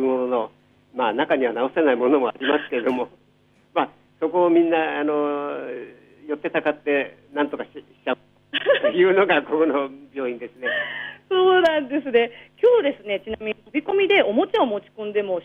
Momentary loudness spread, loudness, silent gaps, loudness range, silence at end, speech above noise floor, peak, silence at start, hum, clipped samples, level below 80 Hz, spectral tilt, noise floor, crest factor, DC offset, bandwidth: 12 LU; -22 LUFS; none; 4 LU; 0 s; 38 dB; -6 dBFS; 0 s; 50 Hz at -55 dBFS; under 0.1%; -64 dBFS; -6.5 dB/octave; -59 dBFS; 16 dB; under 0.1%; 6.6 kHz